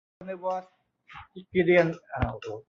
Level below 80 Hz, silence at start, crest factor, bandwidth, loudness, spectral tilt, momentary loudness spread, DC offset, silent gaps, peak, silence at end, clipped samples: -46 dBFS; 0.2 s; 20 dB; 7 kHz; -27 LUFS; -8 dB/octave; 24 LU; under 0.1%; none; -8 dBFS; 0.05 s; under 0.1%